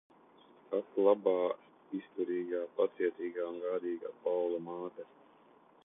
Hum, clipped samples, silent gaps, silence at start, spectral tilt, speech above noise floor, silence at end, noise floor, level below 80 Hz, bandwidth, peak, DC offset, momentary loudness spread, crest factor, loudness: none; under 0.1%; none; 0.7 s; -9 dB/octave; 29 dB; 0.8 s; -63 dBFS; -86 dBFS; 3.8 kHz; -14 dBFS; under 0.1%; 14 LU; 20 dB; -35 LUFS